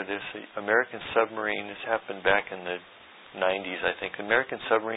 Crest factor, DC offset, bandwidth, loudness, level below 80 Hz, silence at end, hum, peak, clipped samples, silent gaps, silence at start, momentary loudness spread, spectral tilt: 22 dB; under 0.1%; 4 kHz; -28 LUFS; -62 dBFS; 0 s; none; -6 dBFS; under 0.1%; none; 0 s; 10 LU; -8 dB/octave